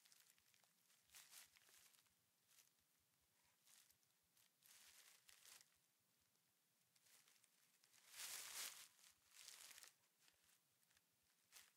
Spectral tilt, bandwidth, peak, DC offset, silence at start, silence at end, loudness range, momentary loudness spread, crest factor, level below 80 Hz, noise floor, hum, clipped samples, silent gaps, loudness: 2 dB/octave; 16 kHz; -38 dBFS; under 0.1%; 0 s; 0 s; 4 LU; 16 LU; 28 dB; under -90 dBFS; -85 dBFS; none; under 0.1%; none; -59 LUFS